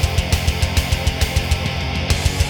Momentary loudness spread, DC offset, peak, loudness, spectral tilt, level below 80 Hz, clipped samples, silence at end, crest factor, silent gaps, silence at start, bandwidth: 2 LU; under 0.1%; 0 dBFS; -19 LUFS; -4 dB/octave; -24 dBFS; under 0.1%; 0 s; 18 dB; none; 0 s; over 20 kHz